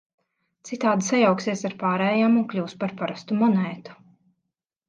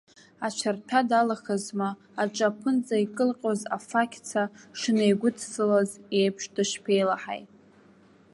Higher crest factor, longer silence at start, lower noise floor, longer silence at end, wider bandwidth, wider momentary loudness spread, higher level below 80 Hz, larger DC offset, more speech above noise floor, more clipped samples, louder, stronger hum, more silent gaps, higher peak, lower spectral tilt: about the same, 18 dB vs 18 dB; first, 0.65 s vs 0.4 s; first, -82 dBFS vs -57 dBFS; about the same, 0.95 s vs 0.9 s; second, 9.2 kHz vs 11.5 kHz; first, 11 LU vs 8 LU; about the same, -72 dBFS vs -76 dBFS; neither; first, 59 dB vs 30 dB; neither; first, -23 LUFS vs -27 LUFS; neither; neither; about the same, -8 dBFS vs -8 dBFS; about the same, -5.5 dB/octave vs -4.5 dB/octave